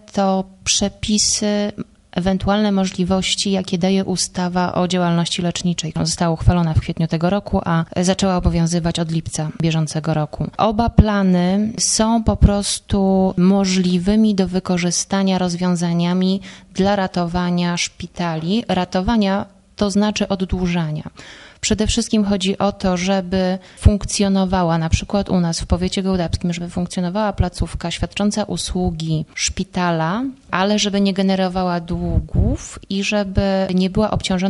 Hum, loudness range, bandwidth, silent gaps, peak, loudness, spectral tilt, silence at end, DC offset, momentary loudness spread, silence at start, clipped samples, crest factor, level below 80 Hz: none; 4 LU; 11.5 kHz; none; 0 dBFS; -18 LUFS; -5 dB/octave; 0 s; under 0.1%; 7 LU; 0.15 s; under 0.1%; 18 dB; -30 dBFS